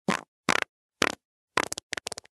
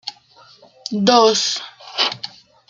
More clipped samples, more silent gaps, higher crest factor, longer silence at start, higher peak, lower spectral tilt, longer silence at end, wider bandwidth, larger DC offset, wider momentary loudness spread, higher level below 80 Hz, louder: neither; first, 0.28-0.44 s, 0.69-0.89 s, 1.25-1.48 s vs none; first, 32 dB vs 20 dB; about the same, 0.1 s vs 0.05 s; about the same, 0 dBFS vs 0 dBFS; about the same, -2.5 dB/octave vs -3 dB/octave; first, 0.6 s vs 0.4 s; first, 12.5 kHz vs 9.6 kHz; neither; second, 8 LU vs 20 LU; about the same, -64 dBFS vs -68 dBFS; second, -30 LUFS vs -17 LUFS